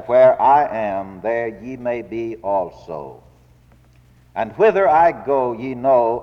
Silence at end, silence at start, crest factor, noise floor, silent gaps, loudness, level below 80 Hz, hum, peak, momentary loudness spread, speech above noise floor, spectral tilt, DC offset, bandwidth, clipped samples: 0 s; 0 s; 16 dB; -51 dBFS; none; -18 LUFS; -52 dBFS; none; -4 dBFS; 16 LU; 33 dB; -7.5 dB/octave; under 0.1%; 6.4 kHz; under 0.1%